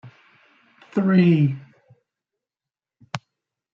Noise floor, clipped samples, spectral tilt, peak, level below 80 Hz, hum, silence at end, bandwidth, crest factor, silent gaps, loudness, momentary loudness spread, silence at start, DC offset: under -90 dBFS; under 0.1%; -8.5 dB/octave; -6 dBFS; -68 dBFS; none; 0.55 s; 7.4 kHz; 18 dB; none; -19 LUFS; 19 LU; 0.05 s; under 0.1%